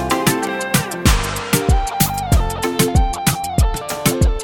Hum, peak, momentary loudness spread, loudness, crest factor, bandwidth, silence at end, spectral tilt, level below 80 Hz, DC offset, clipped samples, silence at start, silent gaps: none; 0 dBFS; 3 LU; -18 LUFS; 16 dB; 19.5 kHz; 0 s; -4.5 dB/octave; -22 dBFS; under 0.1%; under 0.1%; 0 s; none